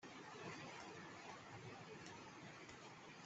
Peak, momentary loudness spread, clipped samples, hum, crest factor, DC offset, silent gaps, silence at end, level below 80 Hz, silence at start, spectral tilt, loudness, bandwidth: -38 dBFS; 4 LU; under 0.1%; none; 18 dB; under 0.1%; none; 0 s; -84 dBFS; 0 s; -4 dB/octave; -56 LUFS; 8.2 kHz